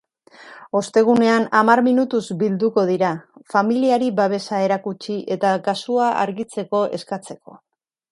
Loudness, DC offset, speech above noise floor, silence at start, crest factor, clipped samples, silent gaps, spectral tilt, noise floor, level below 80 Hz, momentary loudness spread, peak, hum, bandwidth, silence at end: -19 LUFS; under 0.1%; 27 dB; 0.4 s; 20 dB; under 0.1%; none; -6 dB/octave; -46 dBFS; -68 dBFS; 13 LU; 0 dBFS; none; 11.5 kHz; 0.55 s